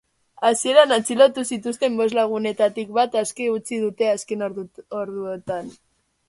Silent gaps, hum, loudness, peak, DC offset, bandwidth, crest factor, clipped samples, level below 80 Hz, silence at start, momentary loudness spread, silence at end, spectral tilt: none; none; -21 LUFS; -2 dBFS; under 0.1%; 11.5 kHz; 20 dB; under 0.1%; -68 dBFS; 0.4 s; 14 LU; 0.55 s; -3 dB/octave